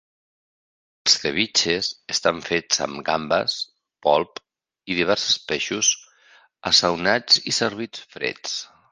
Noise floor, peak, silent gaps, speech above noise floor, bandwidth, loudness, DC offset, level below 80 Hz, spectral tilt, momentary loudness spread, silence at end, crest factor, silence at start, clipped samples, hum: -55 dBFS; -2 dBFS; none; 33 dB; 10.5 kHz; -21 LUFS; under 0.1%; -58 dBFS; -1.5 dB/octave; 13 LU; 0.25 s; 22 dB; 1.05 s; under 0.1%; none